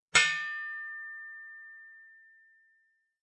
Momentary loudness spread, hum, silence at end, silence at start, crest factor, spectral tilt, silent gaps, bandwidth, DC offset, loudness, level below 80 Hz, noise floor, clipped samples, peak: 26 LU; none; 1.1 s; 0.15 s; 26 dB; 1 dB/octave; none; 11 kHz; under 0.1%; -30 LUFS; -70 dBFS; -73 dBFS; under 0.1%; -10 dBFS